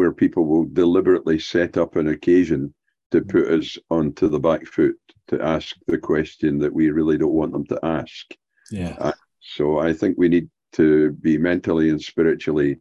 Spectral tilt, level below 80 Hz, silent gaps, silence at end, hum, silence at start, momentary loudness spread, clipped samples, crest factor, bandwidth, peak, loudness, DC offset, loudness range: -7.5 dB/octave; -46 dBFS; 3.06-3.10 s; 0.05 s; none; 0 s; 9 LU; under 0.1%; 14 dB; 7.6 kHz; -6 dBFS; -20 LUFS; under 0.1%; 4 LU